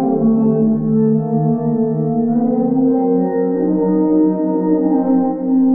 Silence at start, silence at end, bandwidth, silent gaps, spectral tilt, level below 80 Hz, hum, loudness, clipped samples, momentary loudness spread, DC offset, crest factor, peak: 0 s; 0 s; 2 kHz; none; -14.5 dB/octave; -54 dBFS; none; -15 LUFS; under 0.1%; 3 LU; 0.4%; 10 dB; -4 dBFS